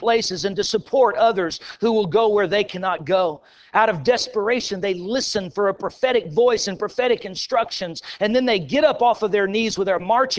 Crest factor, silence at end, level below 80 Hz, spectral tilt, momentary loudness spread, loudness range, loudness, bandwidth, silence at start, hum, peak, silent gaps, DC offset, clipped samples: 16 dB; 0 s; -56 dBFS; -4 dB/octave; 6 LU; 2 LU; -20 LUFS; 8 kHz; 0 s; none; -4 dBFS; none; under 0.1%; under 0.1%